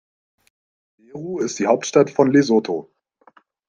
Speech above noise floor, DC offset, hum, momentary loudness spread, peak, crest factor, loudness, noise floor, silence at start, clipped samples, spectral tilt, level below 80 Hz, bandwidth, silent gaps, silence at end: 37 dB; under 0.1%; none; 15 LU; -2 dBFS; 20 dB; -19 LUFS; -55 dBFS; 1.15 s; under 0.1%; -5.5 dB/octave; -66 dBFS; 9.6 kHz; none; 0.85 s